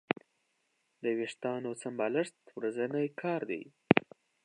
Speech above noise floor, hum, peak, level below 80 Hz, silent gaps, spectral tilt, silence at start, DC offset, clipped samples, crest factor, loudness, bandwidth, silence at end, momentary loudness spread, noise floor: 43 dB; none; -4 dBFS; -72 dBFS; none; -6 dB/octave; 1 s; under 0.1%; under 0.1%; 30 dB; -34 LUFS; 10.5 kHz; 0.45 s; 11 LU; -78 dBFS